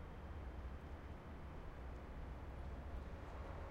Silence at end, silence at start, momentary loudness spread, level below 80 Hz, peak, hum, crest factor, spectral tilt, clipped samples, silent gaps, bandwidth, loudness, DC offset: 0 s; 0 s; 2 LU; -52 dBFS; -38 dBFS; none; 12 dB; -7.5 dB/octave; under 0.1%; none; 11 kHz; -53 LUFS; under 0.1%